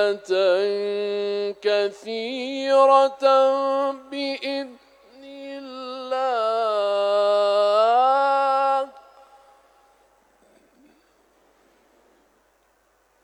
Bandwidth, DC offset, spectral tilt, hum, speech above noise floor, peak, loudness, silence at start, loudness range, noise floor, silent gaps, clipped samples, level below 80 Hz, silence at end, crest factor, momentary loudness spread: 10.5 kHz; under 0.1%; -3.5 dB/octave; none; 42 dB; -4 dBFS; -21 LUFS; 0 s; 7 LU; -63 dBFS; none; under 0.1%; -76 dBFS; 4.25 s; 18 dB; 16 LU